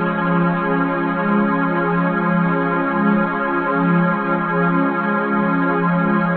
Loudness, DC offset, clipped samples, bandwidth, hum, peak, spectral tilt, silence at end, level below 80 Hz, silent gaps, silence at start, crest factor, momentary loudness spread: -18 LUFS; 0.2%; under 0.1%; 4.4 kHz; none; -4 dBFS; -12 dB/octave; 0 s; -54 dBFS; none; 0 s; 12 dB; 2 LU